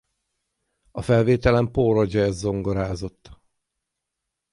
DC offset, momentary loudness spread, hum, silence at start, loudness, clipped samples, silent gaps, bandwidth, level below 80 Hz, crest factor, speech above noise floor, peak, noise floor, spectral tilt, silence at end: under 0.1%; 14 LU; none; 0.95 s; -21 LUFS; under 0.1%; none; 11.5 kHz; -42 dBFS; 20 dB; 61 dB; -4 dBFS; -82 dBFS; -7.5 dB/octave; 1.2 s